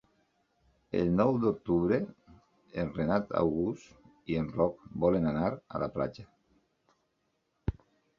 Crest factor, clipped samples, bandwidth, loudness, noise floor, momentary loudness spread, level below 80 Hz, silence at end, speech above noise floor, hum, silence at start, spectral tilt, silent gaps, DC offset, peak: 20 dB; under 0.1%; 7.2 kHz; -31 LUFS; -78 dBFS; 12 LU; -52 dBFS; 0.45 s; 48 dB; none; 0.95 s; -9 dB/octave; none; under 0.1%; -12 dBFS